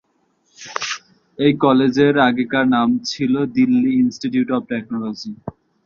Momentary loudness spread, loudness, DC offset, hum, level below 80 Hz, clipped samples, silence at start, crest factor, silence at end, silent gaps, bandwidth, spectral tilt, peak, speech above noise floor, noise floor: 15 LU; -18 LUFS; under 0.1%; none; -58 dBFS; under 0.1%; 0.6 s; 16 dB; 0.35 s; none; 7.2 kHz; -5.5 dB/octave; -2 dBFS; 47 dB; -64 dBFS